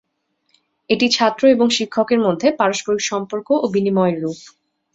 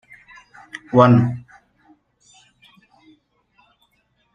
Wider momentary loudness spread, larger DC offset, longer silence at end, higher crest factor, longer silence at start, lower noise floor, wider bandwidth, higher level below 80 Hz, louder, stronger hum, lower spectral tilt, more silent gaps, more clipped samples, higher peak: second, 8 LU vs 25 LU; neither; second, 0.55 s vs 2.95 s; about the same, 16 dB vs 20 dB; about the same, 0.9 s vs 0.95 s; first, -69 dBFS vs -65 dBFS; about the same, 8 kHz vs 7.6 kHz; about the same, -62 dBFS vs -58 dBFS; about the same, -17 LUFS vs -15 LUFS; neither; second, -4.5 dB/octave vs -9 dB/octave; neither; neither; about the same, -2 dBFS vs -2 dBFS